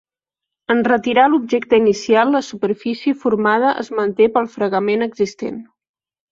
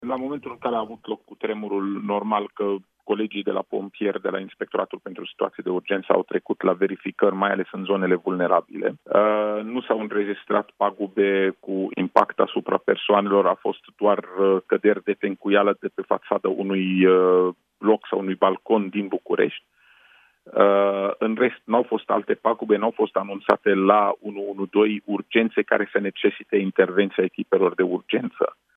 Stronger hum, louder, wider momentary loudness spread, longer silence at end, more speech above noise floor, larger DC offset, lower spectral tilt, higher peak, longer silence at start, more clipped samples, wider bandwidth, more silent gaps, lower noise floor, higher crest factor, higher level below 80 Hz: neither; first, -17 LUFS vs -23 LUFS; about the same, 8 LU vs 9 LU; first, 0.7 s vs 0.25 s; first, 68 dB vs 34 dB; neither; second, -5.5 dB/octave vs -8.5 dB/octave; about the same, -2 dBFS vs 0 dBFS; first, 0.7 s vs 0 s; neither; first, 7.6 kHz vs 4.9 kHz; neither; first, -85 dBFS vs -56 dBFS; second, 16 dB vs 22 dB; first, -60 dBFS vs -74 dBFS